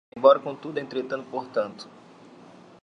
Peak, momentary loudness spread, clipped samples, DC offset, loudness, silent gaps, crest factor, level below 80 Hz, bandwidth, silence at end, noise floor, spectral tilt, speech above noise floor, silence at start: -4 dBFS; 17 LU; under 0.1%; under 0.1%; -25 LUFS; none; 22 dB; -76 dBFS; 6.4 kHz; 0.95 s; -49 dBFS; -6 dB/octave; 25 dB; 0.15 s